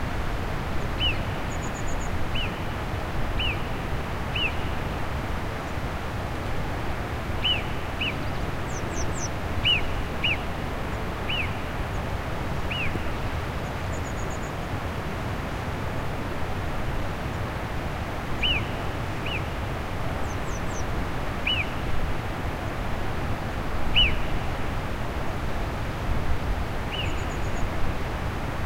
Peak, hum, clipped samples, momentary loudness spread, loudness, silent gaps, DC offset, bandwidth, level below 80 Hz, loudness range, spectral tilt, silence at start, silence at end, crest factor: -8 dBFS; none; under 0.1%; 7 LU; -29 LUFS; none; under 0.1%; 16 kHz; -32 dBFS; 4 LU; -4.5 dB/octave; 0 s; 0 s; 18 dB